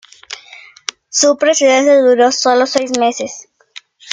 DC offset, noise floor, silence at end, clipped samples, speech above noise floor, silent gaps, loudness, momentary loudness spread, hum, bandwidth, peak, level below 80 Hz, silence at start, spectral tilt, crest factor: under 0.1%; -40 dBFS; 0 s; under 0.1%; 29 dB; none; -12 LUFS; 20 LU; none; 9.6 kHz; 0 dBFS; -66 dBFS; 0.3 s; -1 dB/octave; 14 dB